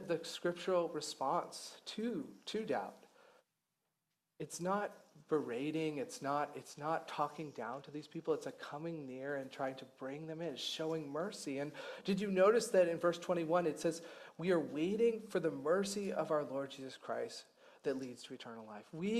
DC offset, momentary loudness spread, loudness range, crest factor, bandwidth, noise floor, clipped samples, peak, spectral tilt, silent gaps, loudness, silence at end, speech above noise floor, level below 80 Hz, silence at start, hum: under 0.1%; 13 LU; 8 LU; 20 dB; 14.5 kHz; -88 dBFS; under 0.1%; -20 dBFS; -5 dB/octave; none; -39 LUFS; 0 s; 49 dB; -82 dBFS; 0 s; none